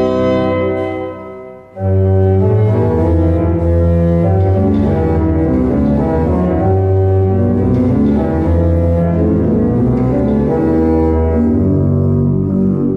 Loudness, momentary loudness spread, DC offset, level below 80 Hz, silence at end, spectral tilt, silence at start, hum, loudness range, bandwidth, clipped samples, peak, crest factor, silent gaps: -13 LUFS; 3 LU; under 0.1%; -28 dBFS; 0 s; -11 dB/octave; 0 s; none; 1 LU; 4.3 kHz; under 0.1%; -2 dBFS; 10 dB; none